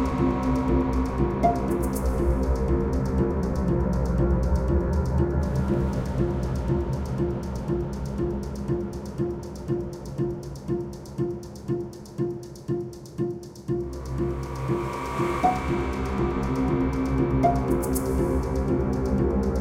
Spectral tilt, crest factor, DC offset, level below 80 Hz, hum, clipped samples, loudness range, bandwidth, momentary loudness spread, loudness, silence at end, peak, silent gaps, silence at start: -8 dB/octave; 16 dB; under 0.1%; -32 dBFS; none; under 0.1%; 7 LU; 16.5 kHz; 8 LU; -27 LUFS; 0 s; -8 dBFS; none; 0 s